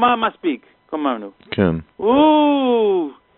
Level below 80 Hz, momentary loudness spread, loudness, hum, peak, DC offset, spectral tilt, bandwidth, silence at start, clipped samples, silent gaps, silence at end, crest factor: -52 dBFS; 14 LU; -18 LUFS; none; -2 dBFS; under 0.1%; -4.5 dB/octave; 4.3 kHz; 0 s; under 0.1%; none; 0.25 s; 16 dB